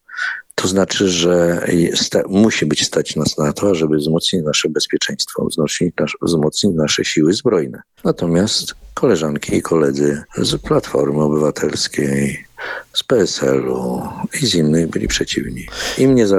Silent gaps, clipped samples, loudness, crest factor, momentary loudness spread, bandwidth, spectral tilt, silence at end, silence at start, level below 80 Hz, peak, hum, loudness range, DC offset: none; under 0.1%; -17 LUFS; 14 dB; 7 LU; 15 kHz; -4.5 dB/octave; 0 s; 0.1 s; -42 dBFS; -2 dBFS; none; 2 LU; under 0.1%